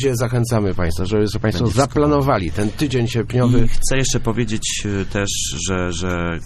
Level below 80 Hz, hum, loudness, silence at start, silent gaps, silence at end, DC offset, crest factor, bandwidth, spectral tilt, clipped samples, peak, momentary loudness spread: -26 dBFS; none; -19 LUFS; 0 s; none; 0 s; under 0.1%; 16 dB; 14 kHz; -5 dB/octave; under 0.1%; -2 dBFS; 5 LU